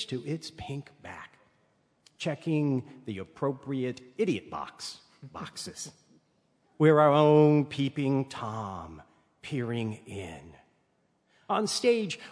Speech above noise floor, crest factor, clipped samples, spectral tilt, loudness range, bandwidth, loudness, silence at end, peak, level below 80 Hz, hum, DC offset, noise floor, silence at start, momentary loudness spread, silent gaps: 43 dB; 22 dB; under 0.1%; -6 dB/octave; 11 LU; 11 kHz; -28 LUFS; 0 s; -8 dBFS; -66 dBFS; none; under 0.1%; -72 dBFS; 0 s; 22 LU; none